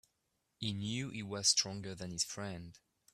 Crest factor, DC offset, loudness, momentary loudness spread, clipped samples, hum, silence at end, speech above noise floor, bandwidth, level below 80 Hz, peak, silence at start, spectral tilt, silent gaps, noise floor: 24 dB; under 0.1%; -36 LUFS; 15 LU; under 0.1%; none; 0.35 s; 44 dB; 15.5 kHz; -70 dBFS; -16 dBFS; 0.6 s; -2.5 dB/octave; none; -83 dBFS